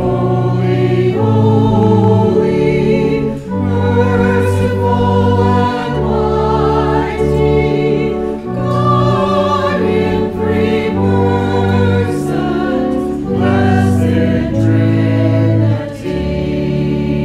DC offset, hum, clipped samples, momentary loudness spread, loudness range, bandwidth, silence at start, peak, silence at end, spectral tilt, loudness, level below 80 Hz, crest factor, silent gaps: under 0.1%; none; under 0.1%; 5 LU; 2 LU; 11.5 kHz; 0 s; 0 dBFS; 0 s; -8.5 dB/octave; -13 LUFS; -30 dBFS; 12 dB; none